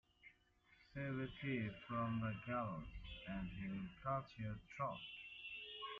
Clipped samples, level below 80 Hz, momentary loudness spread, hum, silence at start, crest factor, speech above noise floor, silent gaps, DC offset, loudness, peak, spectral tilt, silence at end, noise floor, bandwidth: under 0.1%; -64 dBFS; 10 LU; none; 0.25 s; 18 dB; 28 dB; none; under 0.1%; -47 LUFS; -30 dBFS; -5 dB/octave; 0 s; -74 dBFS; 7.2 kHz